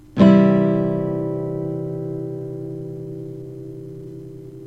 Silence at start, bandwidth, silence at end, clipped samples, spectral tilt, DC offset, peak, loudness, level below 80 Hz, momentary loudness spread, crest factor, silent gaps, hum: 0.15 s; 5.2 kHz; 0 s; under 0.1%; -9.5 dB/octave; 0.2%; -2 dBFS; -20 LUFS; -54 dBFS; 22 LU; 18 dB; none; none